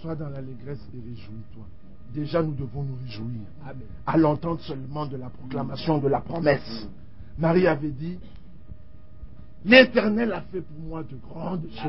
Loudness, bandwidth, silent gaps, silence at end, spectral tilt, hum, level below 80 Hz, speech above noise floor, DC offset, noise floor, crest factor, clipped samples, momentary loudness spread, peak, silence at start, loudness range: -24 LUFS; 5.8 kHz; none; 0 s; -10.5 dB/octave; none; -48 dBFS; 22 dB; 1%; -48 dBFS; 24 dB; under 0.1%; 20 LU; -2 dBFS; 0 s; 11 LU